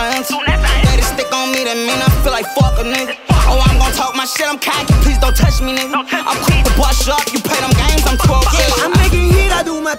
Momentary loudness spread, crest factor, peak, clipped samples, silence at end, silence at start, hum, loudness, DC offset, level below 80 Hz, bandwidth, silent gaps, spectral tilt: 4 LU; 12 dB; 0 dBFS; under 0.1%; 0 s; 0 s; none; -13 LUFS; under 0.1%; -16 dBFS; 16.5 kHz; none; -4 dB/octave